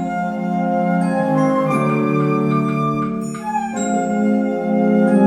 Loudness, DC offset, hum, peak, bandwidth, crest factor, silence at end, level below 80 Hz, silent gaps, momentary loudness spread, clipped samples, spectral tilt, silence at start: -18 LUFS; under 0.1%; none; -4 dBFS; 12 kHz; 14 dB; 0 s; -54 dBFS; none; 6 LU; under 0.1%; -7.5 dB/octave; 0 s